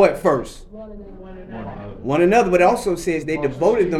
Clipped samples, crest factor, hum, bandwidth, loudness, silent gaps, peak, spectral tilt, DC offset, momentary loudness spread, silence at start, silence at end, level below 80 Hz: under 0.1%; 18 dB; none; 14 kHz; -18 LUFS; none; -2 dBFS; -6 dB/octave; under 0.1%; 23 LU; 0 s; 0 s; -42 dBFS